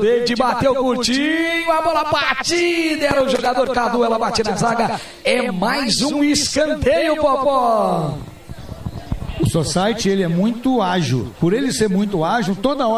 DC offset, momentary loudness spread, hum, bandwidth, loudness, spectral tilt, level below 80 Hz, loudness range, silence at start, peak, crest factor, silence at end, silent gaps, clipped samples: under 0.1%; 6 LU; none; 15.5 kHz; -17 LUFS; -4.5 dB/octave; -40 dBFS; 3 LU; 0 s; 0 dBFS; 16 dB; 0 s; none; under 0.1%